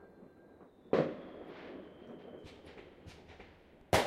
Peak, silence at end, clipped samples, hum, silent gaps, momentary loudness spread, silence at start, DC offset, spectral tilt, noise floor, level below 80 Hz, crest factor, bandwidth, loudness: -14 dBFS; 0 s; under 0.1%; none; none; 25 LU; 0 s; under 0.1%; -4.5 dB/octave; -60 dBFS; -60 dBFS; 26 dB; 15.5 kHz; -38 LUFS